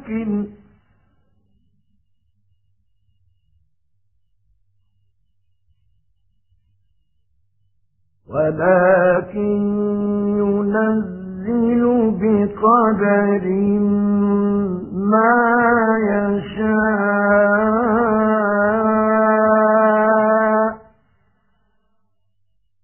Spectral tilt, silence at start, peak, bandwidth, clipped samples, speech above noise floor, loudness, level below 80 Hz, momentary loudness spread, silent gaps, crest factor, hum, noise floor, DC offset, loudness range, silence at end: -2.5 dB/octave; 0 s; -2 dBFS; 3.2 kHz; under 0.1%; 55 dB; -17 LUFS; -50 dBFS; 8 LU; none; 16 dB; none; -71 dBFS; under 0.1%; 5 LU; 2.05 s